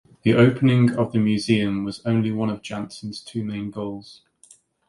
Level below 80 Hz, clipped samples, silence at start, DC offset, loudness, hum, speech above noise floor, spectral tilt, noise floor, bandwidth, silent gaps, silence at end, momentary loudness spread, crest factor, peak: -56 dBFS; under 0.1%; 0.25 s; under 0.1%; -22 LUFS; none; 33 dB; -7 dB/octave; -54 dBFS; 11.5 kHz; none; 0.75 s; 15 LU; 20 dB; -2 dBFS